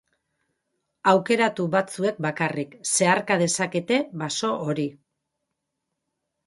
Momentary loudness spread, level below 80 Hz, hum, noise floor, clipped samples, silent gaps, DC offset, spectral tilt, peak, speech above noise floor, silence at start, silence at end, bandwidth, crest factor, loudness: 8 LU; -70 dBFS; none; -81 dBFS; under 0.1%; none; under 0.1%; -4 dB/octave; -4 dBFS; 58 dB; 1.05 s; 1.55 s; 11.5 kHz; 22 dB; -23 LUFS